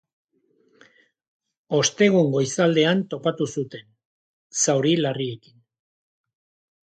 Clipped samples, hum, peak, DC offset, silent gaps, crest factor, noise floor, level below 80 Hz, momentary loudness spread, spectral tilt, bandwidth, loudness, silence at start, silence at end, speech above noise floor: under 0.1%; none; -6 dBFS; under 0.1%; 4.05-4.50 s; 20 dB; -65 dBFS; -68 dBFS; 13 LU; -4.5 dB/octave; 9.6 kHz; -21 LUFS; 1.7 s; 1.55 s; 44 dB